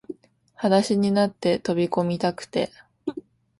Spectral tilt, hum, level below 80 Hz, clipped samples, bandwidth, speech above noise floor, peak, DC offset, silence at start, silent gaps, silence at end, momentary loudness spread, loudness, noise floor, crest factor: -6 dB/octave; none; -62 dBFS; under 0.1%; 11.5 kHz; 20 dB; -6 dBFS; under 0.1%; 0.1 s; none; 0.4 s; 15 LU; -24 LUFS; -42 dBFS; 18 dB